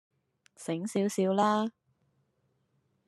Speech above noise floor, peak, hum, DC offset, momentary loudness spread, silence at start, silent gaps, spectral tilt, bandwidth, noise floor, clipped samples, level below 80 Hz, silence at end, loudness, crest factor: 47 dB; -14 dBFS; none; under 0.1%; 11 LU; 0.6 s; none; -5.5 dB/octave; 13 kHz; -75 dBFS; under 0.1%; -84 dBFS; 1.4 s; -30 LUFS; 20 dB